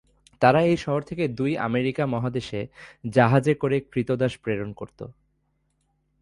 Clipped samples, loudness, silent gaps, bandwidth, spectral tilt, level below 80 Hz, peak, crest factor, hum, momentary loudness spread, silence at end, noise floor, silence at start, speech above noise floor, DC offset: under 0.1%; -24 LUFS; none; 11.5 kHz; -7.5 dB/octave; -56 dBFS; -4 dBFS; 20 dB; none; 18 LU; 1.1 s; -71 dBFS; 0.4 s; 47 dB; under 0.1%